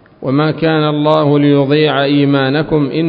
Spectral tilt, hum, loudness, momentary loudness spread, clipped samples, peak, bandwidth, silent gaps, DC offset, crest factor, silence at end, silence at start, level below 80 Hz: -9.5 dB/octave; none; -12 LUFS; 4 LU; under 0.1%; 0 dBFS; 5.2 kHz; none; under 0.1%; 12 dB; 0 s; 0.2 s; -46 dBFS